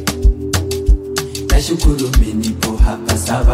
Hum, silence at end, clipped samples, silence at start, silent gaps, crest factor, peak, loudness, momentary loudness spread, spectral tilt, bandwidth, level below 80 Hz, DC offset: none; 0 s; under 0.1%; 0 s; none; 12 dB; 0 dBFS; -17 LUFS; 4 LU; -5 dB/octave; 16 kHz; -16 dBFS; under 0.1%